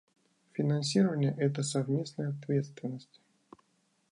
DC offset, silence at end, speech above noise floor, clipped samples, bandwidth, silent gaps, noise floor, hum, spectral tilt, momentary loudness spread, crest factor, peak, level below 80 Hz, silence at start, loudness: under 0.1%; 1.1 s; 42 dB; under 0.1%; 11 kHz; none; -73 dBFS; none; -6 dB/octave; 13 LU; 18 dB; -14 dBFS; -78 dBFS; 0.55 s; -32 LUFS